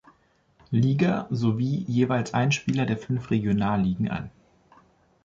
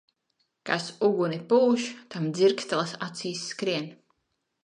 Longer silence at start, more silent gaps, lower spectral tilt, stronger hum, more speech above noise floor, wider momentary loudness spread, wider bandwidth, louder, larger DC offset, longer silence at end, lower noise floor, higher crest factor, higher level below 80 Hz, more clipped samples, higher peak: about the same, 0.7 s vs 0.65 s; neither; first, -7 dB/octave vs -5 dB/octave; neither; second, 39 dB vs 52 dB; second, 5 LU vs 11 LU; second, 7.8 kHz vs 10.5 kHz; about the same, -25 LUFS vs -27 LUFS; neither; first, 0.95 s vs 0.7 s; second, -63 dBFS vs -78 dBFS; about the same, 16 dB vs 20 dB; first, -54 dBFS vs -80 dBFS; neither; about the same, -10 dBFS vs -8 dBFS